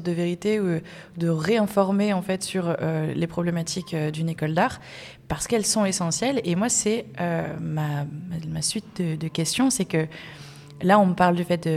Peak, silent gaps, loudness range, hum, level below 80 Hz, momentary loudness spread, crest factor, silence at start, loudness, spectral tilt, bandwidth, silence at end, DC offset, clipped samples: -6 dBFS; none; 3 LU; none; -56 dBFS; 11 LU; 20 dB; 0 s; -24 LUFS; -5 dB/octave; 15.5 kHz; 0 s; under 0.1%; under 0.1%